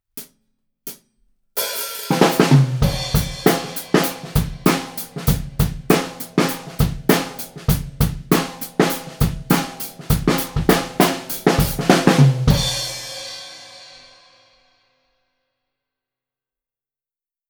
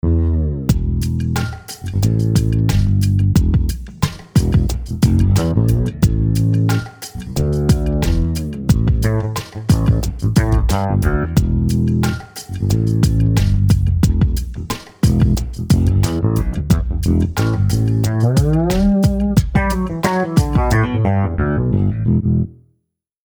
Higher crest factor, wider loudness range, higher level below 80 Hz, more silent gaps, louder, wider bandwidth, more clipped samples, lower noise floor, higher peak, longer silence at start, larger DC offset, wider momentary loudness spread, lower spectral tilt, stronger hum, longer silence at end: about the same, 20 dB vs 16 dB; about the same, 4 LU vs 2 LU; second, -32 dBFS vs -22 dBFS; neither; about the same, -19 LUFS vs -17 LUFS; about the same, over 20 kHz vs over 20 kHz; neither; first, under -90 dBFS vs -69 dBFS; about the same, 0 dBFS vs 0 dBFS; about the same, 0.15 s vs 0.05 s; neither; first, 15 LU vs 7 LU; second, -5 dB/octave vs -7 dB/octave; neither; first, 3.65 s vs 0.85 s